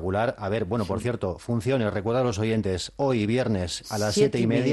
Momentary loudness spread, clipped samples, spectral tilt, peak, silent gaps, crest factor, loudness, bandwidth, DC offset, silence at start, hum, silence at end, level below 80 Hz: 6 LU; under 0.1%; -6 dB/octave; -8 dBFS; none; 16 dB; -26 LUFS; 12.5 kHz; under 0.1%; 0 s; none; 0 s; -50 dBFS